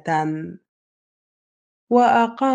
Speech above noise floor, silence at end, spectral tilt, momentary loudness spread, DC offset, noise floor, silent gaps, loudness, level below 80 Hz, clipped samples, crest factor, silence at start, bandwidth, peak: over 72 dB; 0 s; -6.5 dB/octave; 15 LU; under 0.1%; under -90 dBFS; 0.68-1.87 s; -19 LUFS; -68 dBFS; under 0.1%; 18 dB; 0.05 s; 9.2 kHz; -4 dBFS